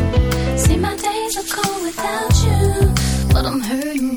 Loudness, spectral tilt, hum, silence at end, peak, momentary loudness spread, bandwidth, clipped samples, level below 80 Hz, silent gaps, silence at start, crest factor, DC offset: -18 LUFS; -5 dB/octave; none; 0 s; -2 dBFS; 6 LU; over 20 kHz; under 0.1%; -24 dBFS; none; 0 s; 16 dB; under 0.1%